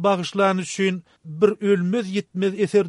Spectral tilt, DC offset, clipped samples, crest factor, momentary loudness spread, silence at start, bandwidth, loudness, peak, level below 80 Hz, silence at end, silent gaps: -6 dB/octave; under 0.1%; under 0.1%; 16 dB; 6 LU; 0 s; 11.5 kHz; -22 LUFS; -4 dBFS; -68 dBFS; 0 s; none